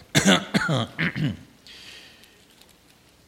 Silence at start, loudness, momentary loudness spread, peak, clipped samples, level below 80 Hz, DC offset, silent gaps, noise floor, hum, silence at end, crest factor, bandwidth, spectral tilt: 0.15 s; -23 LUFS; 25 LU; -2 dBFS; under 0.1%; -56 dBFS; under 0.1%; none; -56 dBFS; 60 Hz at -50 dBFS; 1.25 s; 24 dB; 16.5 kHz; -4 dB/octave